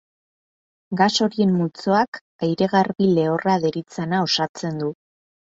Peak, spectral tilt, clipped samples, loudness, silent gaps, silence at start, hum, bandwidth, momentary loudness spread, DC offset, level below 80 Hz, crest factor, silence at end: -4 dBFS; -5.5 dB/octave; under 0.1%; -21 LUFS; 2.08-2.12 s, 2.21-2.39 s, 4.49-4.54 s; 0.9 s; none; 7.8 kHz; 8 LU; under 0.1%; -62 dBFS; 18 dB; 0.5 s